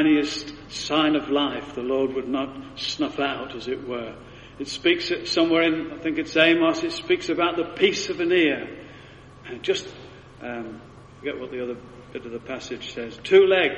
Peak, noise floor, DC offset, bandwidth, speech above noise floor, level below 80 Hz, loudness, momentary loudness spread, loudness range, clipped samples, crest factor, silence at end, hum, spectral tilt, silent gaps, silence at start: -4 dBFS; -45 dBFS; under 0.1%; 10 kHz; 22 dB; -56 dBFS; -24 LUFS; 19 LU; 11 LU; under 0.1%; 20 dB; 0 s; none; -4 dB/octave; none; 0 s